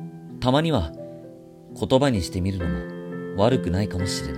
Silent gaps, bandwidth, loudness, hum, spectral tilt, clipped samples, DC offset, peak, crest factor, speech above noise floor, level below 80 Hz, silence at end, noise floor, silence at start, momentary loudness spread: none; 16 kHz; -24 LUFS; none; -6 dB/octave; under 0.1%; under 0.1%; -6 dBFS; 18 dB; 21 dB; -42 dBFS; 0 s; -44 dBFS; 0 s; 18 LU